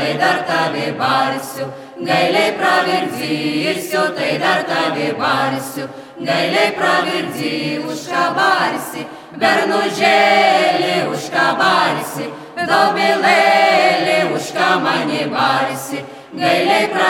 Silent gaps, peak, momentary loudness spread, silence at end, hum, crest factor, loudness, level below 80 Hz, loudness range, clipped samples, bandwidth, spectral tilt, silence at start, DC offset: none; 0 dBFS; 13 LU; 0 s; none; 16 dB; -15 LUFS; -66 dBFS; 4 LU; under 0.1%; 18 kHz; -4 dB/octave; 0 s; under 0.1%